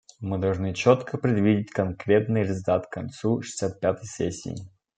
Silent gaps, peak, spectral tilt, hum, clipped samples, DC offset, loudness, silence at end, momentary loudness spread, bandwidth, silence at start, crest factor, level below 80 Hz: none; -4 dBFS; -6.5 dB/octave; none; under 0.1%; under 0.1%; -25 LUFS; 0.3 s; 10 LU; 9.4 kHz; 0.2 s; 22 dB; -60 dBFS